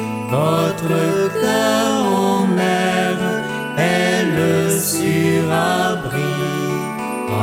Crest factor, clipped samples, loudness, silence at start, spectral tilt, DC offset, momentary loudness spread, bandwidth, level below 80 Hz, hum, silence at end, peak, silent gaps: 12 dB; under 0.1%; -17 LUFS; 0 s; -5 dB/octave; under 0.1%; 5 LU; 17 kHz; -52 dBFS; none; 0 s; -4 dBFS; none